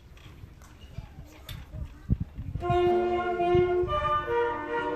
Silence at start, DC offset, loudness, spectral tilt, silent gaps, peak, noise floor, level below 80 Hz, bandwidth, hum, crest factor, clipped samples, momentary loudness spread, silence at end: 0.05 s; under 0.1%; -27 LUFS; -8 dB/octave; none; -10 dBFS; -48 dBFS; -42 dBFS; 13.5 kHz; none; 18 dB; under 0.1%; 21 LU; 0 s